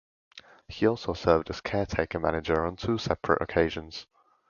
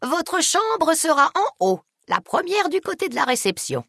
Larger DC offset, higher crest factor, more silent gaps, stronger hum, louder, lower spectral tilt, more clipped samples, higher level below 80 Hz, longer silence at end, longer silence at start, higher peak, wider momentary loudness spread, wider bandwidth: neither; about the same, 22 dB vs 18 dB; neither; neither; second, -28 LUFS vs -20 LUFS; first, -6.5 dB/octave vs -2.5 dB/octave; neither; first, -46 dBFS vs -66 dBFS; first, 0.45 s vs 0.05 s; first, 0.35 s vs 0 s; second, -6 dBFS vs -2 dBFS; about the same, 9 LU vs 7 LU; second, 7.2 kHz vs 12 kHz